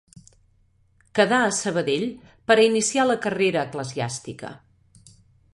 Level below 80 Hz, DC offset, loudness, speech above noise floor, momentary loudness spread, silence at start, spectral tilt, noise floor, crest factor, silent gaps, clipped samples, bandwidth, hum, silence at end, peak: -62 dBFS; under 0.1%; -22 LUFS; 40 dB; 16 LU; 1.15 s; -3.5 dB/octave; -61 dBFS; 20 dB; none; under 0.1%; 11.5 kHz; none; 0.95 s; -4 dBFS